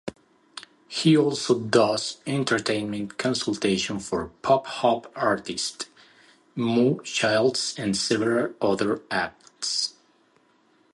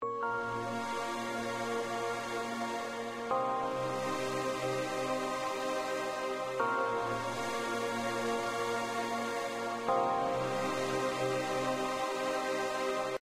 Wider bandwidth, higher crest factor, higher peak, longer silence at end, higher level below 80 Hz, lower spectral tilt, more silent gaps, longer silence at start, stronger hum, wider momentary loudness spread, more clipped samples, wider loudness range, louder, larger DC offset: second, 11.5 kHz vs 16 kHz; about the same, 20 dB vs 16 dB; first, -6 dBFS vs -18 dBFS; first, 1.05 s vs 0.05 s; first, -60 dBFS vs -68 dBFS; about the same, -4 dB/octave vs -4 dB/octave; neither; about the same, 0.05 s vs 0 s; neither; first, 12 LU vs 4 LU; neither; about the same, 2 LU vs 2 LU; first, -24 LUFS vs -34 LUFS; neither